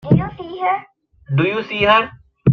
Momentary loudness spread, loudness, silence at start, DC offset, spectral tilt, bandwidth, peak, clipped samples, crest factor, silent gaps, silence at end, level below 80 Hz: 11 LU; -18 LUFS; 0.05 s; under 0.1%; -8.5 dB/octave; 6.2 kHz; -2 dBFS; under 0.1%; 16 dB; none; 0 s; -44 dBFS